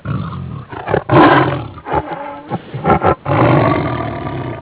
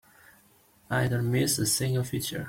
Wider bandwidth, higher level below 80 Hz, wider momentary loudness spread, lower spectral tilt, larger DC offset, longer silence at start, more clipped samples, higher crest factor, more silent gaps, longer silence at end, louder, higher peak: second, 4 kHz vs 16.5 kHz; first, -36 dBFS vs -56 dBFS; first, 16 LU vs 6 LU; first, -11 dB/octave vs -4 dB/octave; neither; second, 0.05 s vs 0.9 s; neither; about the same, 14 dB vs 16 dB; neither; about the same, 0 s vs 0 s; first, -15 LUFS vs -27 LUFS; first, 0 dBFS vs -12 dBFS